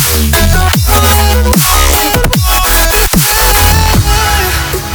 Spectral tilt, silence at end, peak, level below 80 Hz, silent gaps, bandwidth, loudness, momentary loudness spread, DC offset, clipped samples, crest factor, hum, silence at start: -3.5 dB/octave; 0 s; 0 dBFS; -12 dBFS; none; over 20 kHz; -8 LUFS; 3 LU; under 0.1%; 0.6%; 8 dB; none; 0 s